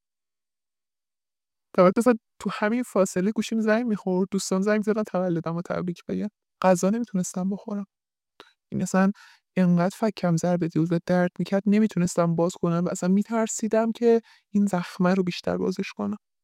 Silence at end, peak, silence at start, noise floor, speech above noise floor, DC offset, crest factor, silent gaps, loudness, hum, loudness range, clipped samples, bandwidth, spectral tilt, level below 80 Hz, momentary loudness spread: 0.25 s; -6 dBFS; 1.75 s; under -90 dBFS; over 66 dB; under 0.1%; 20 dB; none; -25 LUFS; none; 3 LU; under 0.1%; 14 kHz; -6.5 dB/octave; -66 dBFS; 9 LU